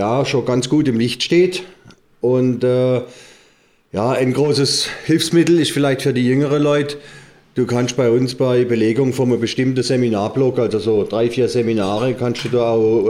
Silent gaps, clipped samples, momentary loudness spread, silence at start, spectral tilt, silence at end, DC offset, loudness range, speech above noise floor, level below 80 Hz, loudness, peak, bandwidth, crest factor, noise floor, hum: none; under 0.1%; 5 LU; 0 s; -5.5 dB/octave; 0 s; under 0.1%; 2 LU; 38 dB; -54 dBFS; -17 LUFS; -4 dBFS; 16 kHz; 12 dB; -55 dBFS; none